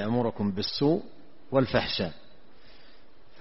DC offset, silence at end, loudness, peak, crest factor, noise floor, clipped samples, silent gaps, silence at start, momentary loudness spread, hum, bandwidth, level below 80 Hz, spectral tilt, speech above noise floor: 0.8%; 1.25 s; -28 LUFS; -10 dBFS; 20 dB; -58 dBFS; under 0.1%; none; 0 s; 6 LU; none; 6 kHz; -54 dBFS; -4.5 dB/octave; 31 dB